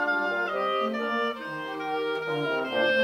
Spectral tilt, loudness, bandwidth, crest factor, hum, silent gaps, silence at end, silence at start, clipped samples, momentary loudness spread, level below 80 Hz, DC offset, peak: -5 dB/octave; -28 LUFS; 16 kHz; 14 dB; none; none; 0 s; 0 s; under 0.1%; 6 LU; -72 dBFS; under 0.1%; -14 dBFS